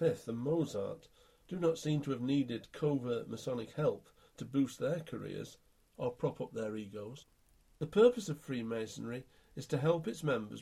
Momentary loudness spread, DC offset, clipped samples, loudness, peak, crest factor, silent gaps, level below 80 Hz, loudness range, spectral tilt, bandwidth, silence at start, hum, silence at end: 13 LU; under 0.1%; under 0.1%; -36 LUFS; -14 dBFS; 22 dB; none; -68 dBFS; 5 LU; -6.5 dB/octave; 14.5 kHz; 0 s; none; 0 s